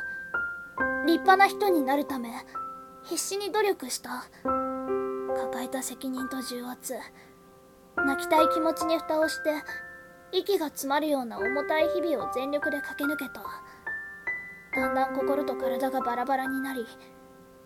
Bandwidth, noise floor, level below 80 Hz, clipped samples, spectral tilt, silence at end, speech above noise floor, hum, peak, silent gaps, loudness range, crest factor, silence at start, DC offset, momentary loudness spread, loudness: 17.5 kHz; -54 dBFS; -62 dBFS; under 0.1%; -3 dB/octave; 0.15 s; 26 dB; none; -6 dBFS; none; 6 LU; 24 dB; 0 s; under 0.1%; 13 LU; -28 LUFS